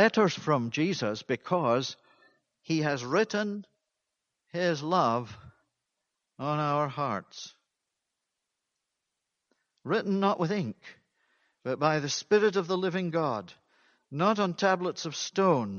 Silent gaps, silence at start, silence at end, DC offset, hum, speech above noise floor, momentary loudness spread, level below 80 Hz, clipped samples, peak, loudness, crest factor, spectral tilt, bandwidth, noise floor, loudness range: none; 0 s; 0 s; under 0.1%; none; 57 dB; 13 LU; -74 dBFS; under 0.1%; -8 dBFS; -29 LUFS; 22 dB; -5 dB/octave; 7.2 kHz; -85 dBFS; 6 LU